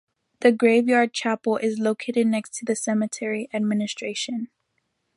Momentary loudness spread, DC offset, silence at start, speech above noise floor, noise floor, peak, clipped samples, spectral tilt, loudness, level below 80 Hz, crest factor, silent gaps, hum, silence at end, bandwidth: 10 LU; under 0.1%; 0.4 s; 52 dB; -74 dBFS; -4 dBFS; under 0.1%; -4.5 dB/octave; -23 LUFS; -74 dBFS; 20 dB; none; none; 0.7 s; 11.5 kHz